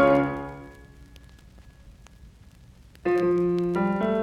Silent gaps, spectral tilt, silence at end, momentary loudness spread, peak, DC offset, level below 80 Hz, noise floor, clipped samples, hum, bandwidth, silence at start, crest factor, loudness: none; -8.5 dB/octave; 0 s; 18 LU; -8 dBFS; under 0.1%; -50 dBFS; -51 dBFS; under 0.1%; none; 7.8 kHz; 0 s; 20 dB; -25 LUFS